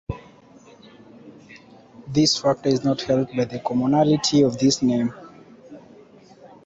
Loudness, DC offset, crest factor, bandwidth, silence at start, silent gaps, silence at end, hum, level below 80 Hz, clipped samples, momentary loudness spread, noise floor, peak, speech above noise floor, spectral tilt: -20 LUFS; under 0.1%; 16 dB; 8.2 kHz; 0.1 s; none; 0.2 s; none; -52 dBFS; under 0.1%; 9 LU; -49 dBFS; -6 dBFS; 29 dB; -5 dB/octave